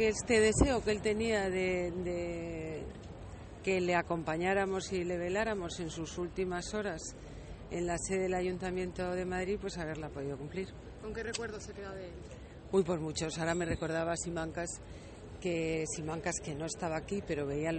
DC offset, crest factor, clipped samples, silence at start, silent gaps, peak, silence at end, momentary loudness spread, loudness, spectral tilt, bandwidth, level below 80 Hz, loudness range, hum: under 0.1%; 22 dB; under 0.1%; 0 s; none; -12 dBFS; 0 s; 14 LU; -35 LUFS; -4.5 dB/octave; 8.8 kHz; -50 dBFS; 4 LU; none